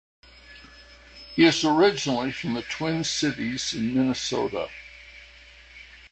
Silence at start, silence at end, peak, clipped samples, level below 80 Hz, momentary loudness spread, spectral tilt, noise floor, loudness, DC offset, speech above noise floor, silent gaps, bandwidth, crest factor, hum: 0.5 s; 0.05 s; -6 dBFS; under 0.1%; -56 dBFS; 25 LU; -4 dB/octave; -49 dBFS; -24 LUFS; under 0.1%; 25 dB; none; 8.8 kHz; 20 dB; none